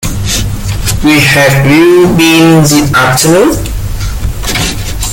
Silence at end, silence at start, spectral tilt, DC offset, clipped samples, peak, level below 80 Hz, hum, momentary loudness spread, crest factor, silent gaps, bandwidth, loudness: 0 s; 0 s; -4.5 dB/octave; under 0.1%; 0.9%; 0 dBFS; -20 dBFS; none; 12 LU; 8 dB; none; 17.5 kHz; -7 LUFS